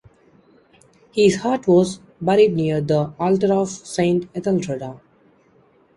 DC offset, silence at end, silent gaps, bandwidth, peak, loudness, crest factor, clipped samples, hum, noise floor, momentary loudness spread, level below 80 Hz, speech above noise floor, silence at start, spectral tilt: under 0.1%; 1 s; none; 11 kHz; -4 dBFS; -19 LUFS; 16 dB; under 0.1%; none; -56 dBFS; 10 LU; -56 dBFS; 38 dB; 1.15 s; -6.5 dB/octave